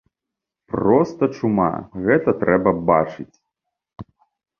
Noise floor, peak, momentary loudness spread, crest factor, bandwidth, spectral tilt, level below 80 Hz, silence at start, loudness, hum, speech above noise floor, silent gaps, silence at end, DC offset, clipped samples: -85 dBFS; -2 dBFS; 11 LU; 20 dB; 7 kHz; -9 dB/octave; -50 dBFS; 0.75 s; -19 LUFS; none; 66 dB; none; 0.55 s; under 0.1%; under 0.1%